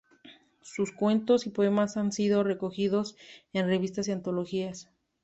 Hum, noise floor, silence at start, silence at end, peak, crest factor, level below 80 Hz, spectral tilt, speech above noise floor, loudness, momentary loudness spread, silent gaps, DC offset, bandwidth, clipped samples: none; -56 dBFS; 0.25 s; 0.4 s; -12 dBFS; 16 dB; -68 dBFS; -6 dB/octave; 28 dB; -29 LUFS; 9 LU; none; under 0.1%; 8.2 kHz; under 0.1%